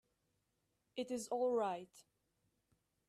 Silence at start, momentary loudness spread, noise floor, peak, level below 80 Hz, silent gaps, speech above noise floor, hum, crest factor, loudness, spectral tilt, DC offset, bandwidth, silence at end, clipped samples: 0.95 s; 14 LU; -84 dBFS; -26 dBFS; -86 dBFS; none; 44 dB; none; 18 dB; -40 LUFS; -4 dB/octave; under 0.1%; 14 kHz; 1.05 s; under 0.1%